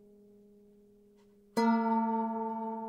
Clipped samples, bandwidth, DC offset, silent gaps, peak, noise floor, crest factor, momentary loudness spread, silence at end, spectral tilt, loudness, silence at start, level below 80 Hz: under 0.1%; 15 kHz; under 0.1%; none; -18 dBFS; -62 dBFS; 16 dB; 8 LU; 0 s; -6.5 dB/octave; -31 LUFS; 1.55 s; -80 dBFS